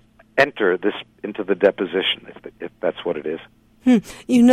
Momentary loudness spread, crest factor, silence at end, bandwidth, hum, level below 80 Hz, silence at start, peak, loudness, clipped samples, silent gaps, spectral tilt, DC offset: 14 LU; 18 dB; 0 s; 12.5 kHz; none; -56 dBFS; 0.35 s; -2 dBFS; -21 LUFS; under 0.1%; none; -5 dB/octave; under 0.1%